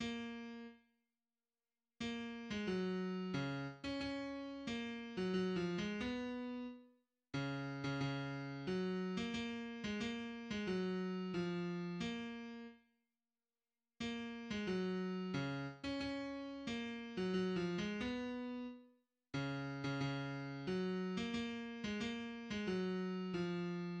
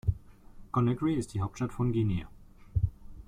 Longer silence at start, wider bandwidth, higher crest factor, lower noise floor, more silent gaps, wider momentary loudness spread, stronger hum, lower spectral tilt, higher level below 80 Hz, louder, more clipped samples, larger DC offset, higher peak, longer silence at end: about the same, 0 s vs 0.05 s; second, 8.8 kHz vs 11 kHz; about the same, 14 dB vs 18 dB; first, under -90 dBFS vs -50 dBFS; neither; about the same, 7 LU vs 8 LU; neither; second, -6 dB/octave vs -8 dB/octave; second, -68 dBFS vs -44 dBFS; second, -43 LUFS vs -32 LUFS; neither; neither; second, -28 dBFS vs -14 dBFS; about the same, 0 s vs 0.05 s